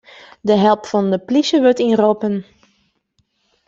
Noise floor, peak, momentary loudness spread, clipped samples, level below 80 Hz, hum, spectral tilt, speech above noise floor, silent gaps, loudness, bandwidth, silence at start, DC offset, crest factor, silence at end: -65 dBFS; -2 dBFS; 8 LU; under 0.1%; -60 dBFS; none; -6 dB/octave; 51 dB; none; -16 LUFS; 7.8 kHz; 0.45 s; under 0.1%; 16 dB; 1.25 s